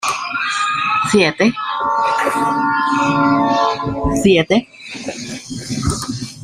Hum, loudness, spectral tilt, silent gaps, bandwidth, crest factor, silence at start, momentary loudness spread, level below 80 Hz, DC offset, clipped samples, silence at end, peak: none; -16 LUFS; -4.5 dB/octave; none; 15.5 kHz; 16 dB; 0 s; 13 LU; -38 dBFS; under 0.1%; under 0.1%; 0 s; -2 dBFS